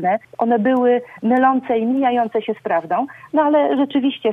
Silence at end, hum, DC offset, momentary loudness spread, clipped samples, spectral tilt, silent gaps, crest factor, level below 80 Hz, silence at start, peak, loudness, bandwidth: 0 s; none; under 0.1%; 6 LU; under 0.1%; -8 dB/octave; none; 14 dB; -68 dBFS; 0 s; -4 dBFS; -18 LUFS; 3.9 kHz